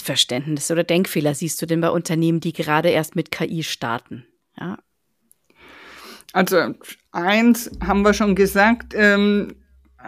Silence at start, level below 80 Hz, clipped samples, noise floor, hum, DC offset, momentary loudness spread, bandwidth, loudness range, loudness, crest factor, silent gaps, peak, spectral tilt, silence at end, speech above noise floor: 0 s; -44 dBFS; under 0.1%; -63 dBFS; none; under 0.1%; 17 LU; 15.5 kHz; 8 LU; -19 LUFS; 18 dB; none; -2 dBFS; -4.5 dB/octave; 0 s; 43 dB